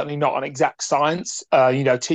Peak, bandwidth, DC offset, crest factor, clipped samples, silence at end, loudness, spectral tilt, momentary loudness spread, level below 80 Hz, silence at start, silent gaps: -4 dBFS; 9.2 kHz; under 0.1%; 16 dB; under 0.1%; 0 s; -20 LUFS; -4.5 dB/octave; 5 LU; -66 dBFS; 0 s; none